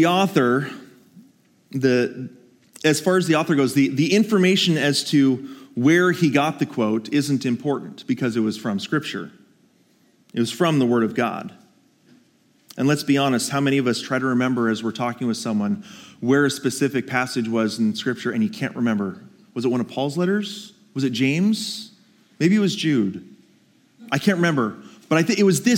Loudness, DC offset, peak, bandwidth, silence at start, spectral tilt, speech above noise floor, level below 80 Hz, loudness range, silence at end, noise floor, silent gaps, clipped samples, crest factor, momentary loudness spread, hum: -21 LUFS; under 0.1%; -4 dBFS; 17 kHz; 0 s; -5 dB/octave; 39 dB; -74 dBFS; 6 LU; 0 s; -59 dBFS; none; under 0.1%; 18 dB; 13 LU; none